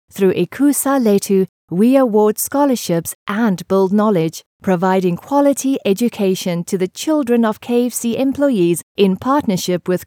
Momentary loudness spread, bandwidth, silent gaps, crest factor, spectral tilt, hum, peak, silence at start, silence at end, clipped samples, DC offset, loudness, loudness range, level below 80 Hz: 6 LU; 18 kHz; 1.49-1.68 s, 3.15-3.26 s, 4.46-4.60 s, 8.83-8.95 s; 14 dB; -5.5 dB/octave; none; 0 dBFS; 0.15 s; 0 s; under 0.1%; under 0.1%; -16 LUFS; 2 LU; -60 dBFS